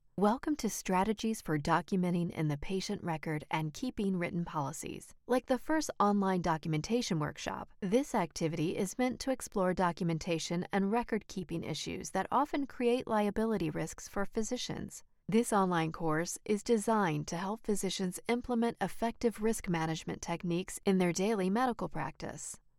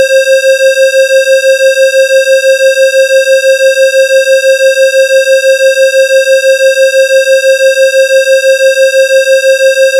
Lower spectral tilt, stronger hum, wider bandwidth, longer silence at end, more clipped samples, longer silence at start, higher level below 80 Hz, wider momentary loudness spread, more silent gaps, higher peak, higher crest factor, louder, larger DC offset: first, -5.5 dB/octave vs 5 dB/octave; neither; about the same, 16.5 kHz vs 16.5 kHz; first, 0.2 s vs 0 s; neither; first, 0.15 s vs 0 s; first, -56 dBFS vs under -90 dBFS; first, 8 LU vs 1 LU; neither; second, -16 dBFS vs -2 dBFS; first, 18 dB vs 4 dB; second, -34 LUFS vs -6 LUFS; neither